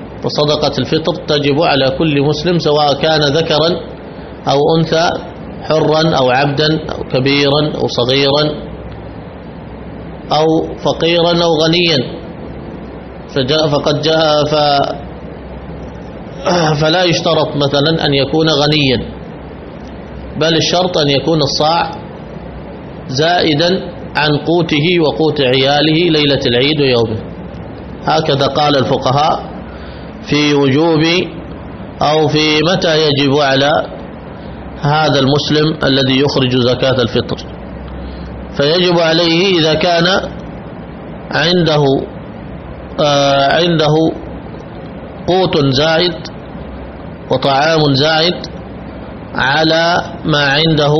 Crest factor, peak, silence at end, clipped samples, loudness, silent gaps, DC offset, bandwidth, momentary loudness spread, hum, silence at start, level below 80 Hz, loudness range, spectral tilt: 14 dB; 0 dBFS; 0 s; under 0.1%; -12 LUFS; none; under 0.1%; 6.4 kHz; 18 LU; none; 0 s; -36 dBFS; 3 LU; -5.5 dB/octave